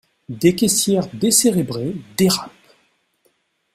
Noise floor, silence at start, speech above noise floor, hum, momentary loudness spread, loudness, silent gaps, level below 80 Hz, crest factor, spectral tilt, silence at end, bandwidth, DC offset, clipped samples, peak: -65 dBFS; 0.3 s; 47 dB; none; 12 LU; -17 LUFS; none; -54 dBFS; 18 dB; -4 dB/octave; 1.25 s; 16 kHz; under 0.1%; under 0.1%; -2 dBFS